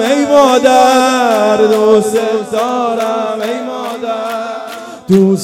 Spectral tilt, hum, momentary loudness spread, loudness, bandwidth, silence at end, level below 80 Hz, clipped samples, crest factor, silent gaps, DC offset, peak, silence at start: -5 dB/octave; none; 13 LU; -11 LUFS; 17 kHz; 0 s; -56 dBFS; 0.5%; 12 dB; none; under 0.1%; 0 dBFS; 0 s